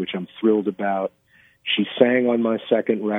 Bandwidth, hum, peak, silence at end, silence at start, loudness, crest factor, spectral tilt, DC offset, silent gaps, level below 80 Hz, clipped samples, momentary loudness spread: 3.9 kHz; none; 0 dBFS; 0 s; 0 s; -21 LUFS; 20 dB; -8 dB/octave; under 0.1%; none; -70 dBFS; under 0.1%; 10 LU